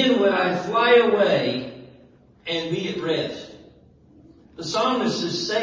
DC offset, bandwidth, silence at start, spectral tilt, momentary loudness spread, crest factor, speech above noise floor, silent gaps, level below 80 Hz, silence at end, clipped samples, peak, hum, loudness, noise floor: under 0.1%; 7.6 kHz; 0 s; -4.5 dB/octave; 19 LU; 18 dB; 31 dB; none; -60 dBFS; 0 s; under 0.1%; -6 dBFS; none; -21 LUFS; -52 dBFS